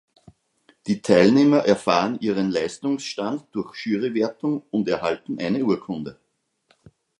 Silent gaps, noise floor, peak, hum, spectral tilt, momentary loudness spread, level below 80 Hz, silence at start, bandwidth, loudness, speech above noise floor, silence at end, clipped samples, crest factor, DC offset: none; -67 dBFS; -2 dBFS; none; -6 dB/octave; 13 LU; -60 dBFS; 0.85 s; 11 kHz; -22 LUFS; 46 dB; 1.05 s; under 0.1%; 20 dB; under 0.1%